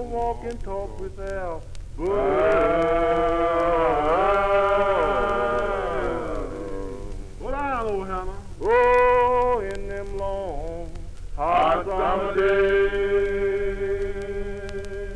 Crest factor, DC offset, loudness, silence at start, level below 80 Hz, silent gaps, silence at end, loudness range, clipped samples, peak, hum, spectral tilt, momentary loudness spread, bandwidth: 14 dB; under 0.1%; -23 LUFS; 0 s; -34 dBFS; none; 0 s; 4 LU; under 0.1%; -8 dBFS; none; -6.5 dB/octave; 14 LU; 11 kHz